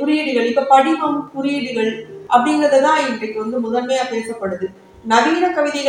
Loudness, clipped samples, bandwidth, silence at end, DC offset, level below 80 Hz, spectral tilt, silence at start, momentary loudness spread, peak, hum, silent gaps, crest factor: -17 LUFS; under 0.1%; 11.5 kHz; 0 s; under 0.1%; -62 dBFS; -4 dB/octave; 0 s; 11 LU; 0 dBFS; none; none; 16 dB